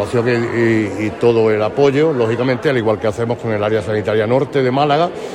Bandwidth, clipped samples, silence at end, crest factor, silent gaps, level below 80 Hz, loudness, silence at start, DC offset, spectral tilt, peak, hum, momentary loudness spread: 11.5 kHz; under 0.1%; 0 s; 14 dB; none; -52 dBFS; -16 LUFS; 0 s; under 0.1%; -7 dB/octave; -2 dBFS; none; 5 LU